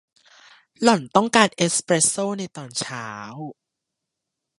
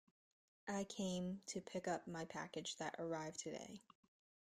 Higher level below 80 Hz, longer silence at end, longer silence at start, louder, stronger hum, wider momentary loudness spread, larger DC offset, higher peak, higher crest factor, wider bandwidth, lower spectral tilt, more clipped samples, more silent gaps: first, -68 dBFS vs -80 dBFS; first, 1.05 s vs 0.65 s; first, 0.8 s vs 0.65 s; first, -20 LUFS vs -47 LUFS; neither; first, 17 LU vs 8 LU; neither; first, 0 dBFS vs -32 dBFS; first, 24 dB vs 16 dB; second, 11.5 kHz vs 14.5 kHz; about the same, -3 dB/octave vs -4 dB/octave; neither; neither